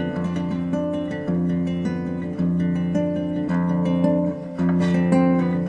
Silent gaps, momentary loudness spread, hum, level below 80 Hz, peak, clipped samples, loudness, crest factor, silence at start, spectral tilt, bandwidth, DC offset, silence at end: none; 7 LU; none; -56 dBFS; -6 dBFS; under 0.1%; -22 LUFS; 16 dB; 0 s; -9 dB/octave; 8.2 kHz; under 0.1%; 0 s